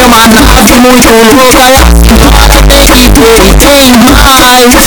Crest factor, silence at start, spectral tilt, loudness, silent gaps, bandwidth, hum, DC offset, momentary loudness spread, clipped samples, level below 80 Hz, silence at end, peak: 0 dB; 0 s; -3.5 dB/octave; -1 LUFS; none; over 20 kHz; none; under 0.1%; 2 LU; 30%; -8 dBFS; 0 s; 0 dBFS